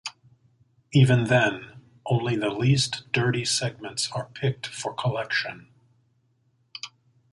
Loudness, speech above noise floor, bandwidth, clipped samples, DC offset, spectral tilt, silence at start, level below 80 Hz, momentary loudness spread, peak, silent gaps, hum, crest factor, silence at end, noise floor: -25 LUFS; 43 dB; 11.5 kHz; under 0.1%; under 0.1%; -5 dB/octave; 0.05 s; -60 dBFS; 19 LU; -6 dBFS; none; none; 20 dB; 0.45 s; -68 dBFS